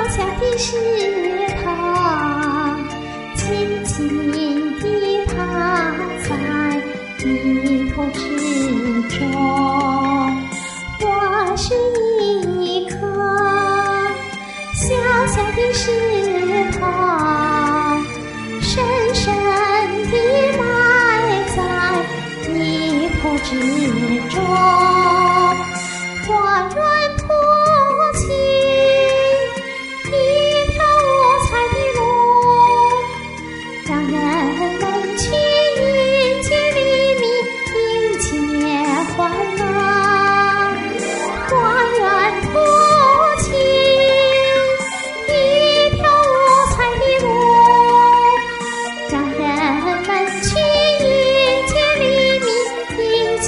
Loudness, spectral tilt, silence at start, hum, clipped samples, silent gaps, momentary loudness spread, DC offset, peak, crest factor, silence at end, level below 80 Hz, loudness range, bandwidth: -16 LUFS; -4 dB/octave; 0 s; none; under 0.1%; none; 9 LU; under 0.1%; 0 dBFS; 16 dB; 0 s; -36 dBFS; 6 LU; 11.5 kHz